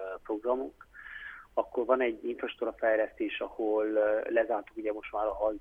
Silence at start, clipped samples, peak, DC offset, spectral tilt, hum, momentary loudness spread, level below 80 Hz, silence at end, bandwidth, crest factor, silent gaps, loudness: 0 s; under 0.1%; -12 dBFS; under 0.1%; -6 dB/octave; none; 13 LU; -62 dBFS; 0 s; 3.7 kHz; 18 dB; none; -31 LUFS